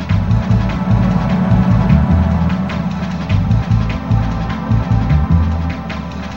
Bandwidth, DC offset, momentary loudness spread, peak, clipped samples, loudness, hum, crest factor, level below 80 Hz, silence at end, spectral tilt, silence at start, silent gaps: 7.2 kHz; 1%; 8 LU; 0 dBFS; under 0.1%; -15 LUFS; none; 14 dB; -22 dBFS; 0 s; -8.5 dB/octave; 0 s; none